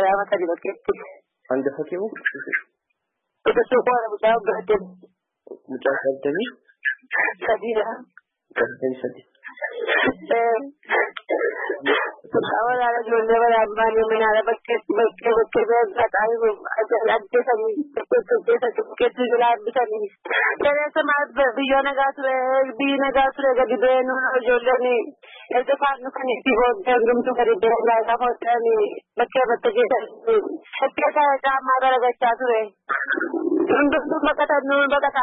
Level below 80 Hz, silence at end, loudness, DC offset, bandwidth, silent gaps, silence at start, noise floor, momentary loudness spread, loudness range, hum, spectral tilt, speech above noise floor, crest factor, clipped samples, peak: -56 dBFS; 0 s; -21 LUFS; under 0.1%; 4 kHz; none; 0 s; -78 dBFS; 8 LU; 5 LU; none; -8.5 dB/octave; 57 dB; 14 dB; under 0.1%; -6 dBFS